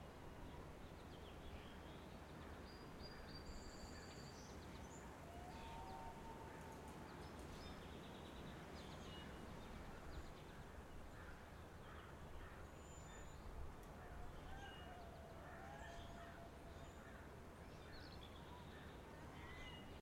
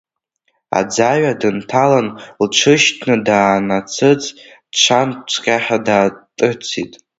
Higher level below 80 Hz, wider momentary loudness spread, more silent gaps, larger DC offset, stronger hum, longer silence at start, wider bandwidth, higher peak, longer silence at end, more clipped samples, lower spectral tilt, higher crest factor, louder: second, -62 dBFS vs -56 dBFS; second, 3 LU vs 9 LU; neither; neither; neither; second, 0 s vs 0.7 s; first, 16.5 kHz vs 8 kHz; second, -40 dBFS vs 0 dBFS; second, 0 s vs 0.35 s; neither; first, -5 dB/octave vs -3.5 dB/octave; about the same, 16 dB vs 16 dB; second, -57 LUFS vs -15 LUFS